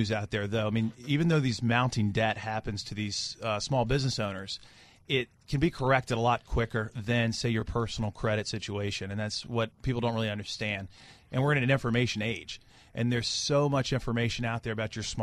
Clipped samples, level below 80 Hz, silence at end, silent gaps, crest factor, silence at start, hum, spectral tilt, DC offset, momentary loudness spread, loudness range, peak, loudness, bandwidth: under 0.1%; -48 dBFS; 0 s; none; 20 dB; 0 s; none; -5 dB/octave; under 0.1%; 8 LU; 3 LU; -10 dBFS; -30 LUFS; 12 kHz